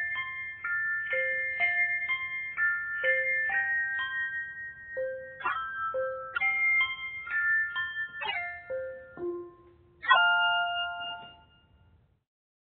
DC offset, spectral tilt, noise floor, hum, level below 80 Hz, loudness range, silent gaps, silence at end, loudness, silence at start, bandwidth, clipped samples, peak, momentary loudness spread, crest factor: under 0.1%; -5.5 dB/octave; -63 dBFS; none; -68 dBFS; 3 LU; none; 1.4 s; -29 LUFS; 0 s; 4.4 kHz; under 0.1%; -8 dBFS; 13 LU; 24 dB